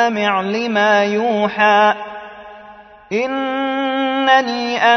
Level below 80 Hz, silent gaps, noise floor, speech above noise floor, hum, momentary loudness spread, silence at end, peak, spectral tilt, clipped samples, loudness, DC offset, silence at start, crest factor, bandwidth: -60 dBFS; none; -40 dBFS; 25 dB; none; 11 LU; 0 s; -2 dBFS; -4.5 dB/octave; under 0.1%; -16 LUFS; under 0.1%; 0 s; 16 dB; 6.4 kHz